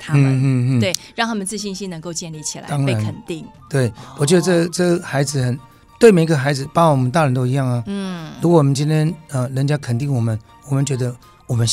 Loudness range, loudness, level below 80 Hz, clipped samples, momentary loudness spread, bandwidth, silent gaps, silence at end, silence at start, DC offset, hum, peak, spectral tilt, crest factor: 5 LU; -18 LUFS; -52 dBFS; under 0.1%; 12 LU; 15 kHz; none; 0 s; 0 s; under 0.1%; none; 0 dBFS; -6 dB/octave; 18 dB